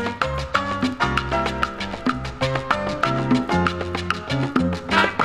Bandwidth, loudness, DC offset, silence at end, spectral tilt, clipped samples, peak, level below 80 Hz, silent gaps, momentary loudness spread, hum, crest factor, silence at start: 13 kHz; -22 LUFS; under 0.1%; 0 s; -5.5 dB/octave; under 0.1%; -2 dBFS; -38 dBFS; none; 6 LU; none; 20 dB; 0 s